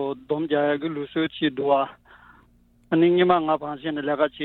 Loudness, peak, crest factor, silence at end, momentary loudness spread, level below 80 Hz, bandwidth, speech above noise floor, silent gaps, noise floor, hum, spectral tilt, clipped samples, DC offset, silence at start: -23 LUFS; -6 dBFS; 18 dB; 0 s; 9 LU; -62 dBFS; 4.2 kHz; 35 dB; none; -58 dBFS; none; -9 dB/octave; under 0.1%; under 0.1%; 0 s